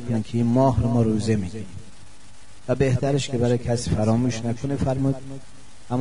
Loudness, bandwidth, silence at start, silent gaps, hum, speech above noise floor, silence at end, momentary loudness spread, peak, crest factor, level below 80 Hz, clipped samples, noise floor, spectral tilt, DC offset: -23 LUFS; 10.5 kHz; 0 s; none; none; 27 dB; 0 s; 18 LU; -6 dBFS; 18 dB; -42 dBFS; under 0.1%; -49 dBFS; -7 dB/octave; 2%